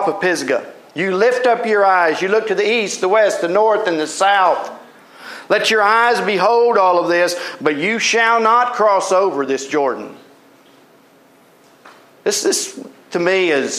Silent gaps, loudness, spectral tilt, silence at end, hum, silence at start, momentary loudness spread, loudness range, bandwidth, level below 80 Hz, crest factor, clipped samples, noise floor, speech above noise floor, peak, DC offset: none; -15 LUFS; -2.5 dB/octave; 0 s; none; 0 s; 10 LU; 9 LU; 15 kHz; -78 dBFS; 16 dB; under 0.1%; -49 dBFS; 34 dB; -2 dBFS; under 0.1%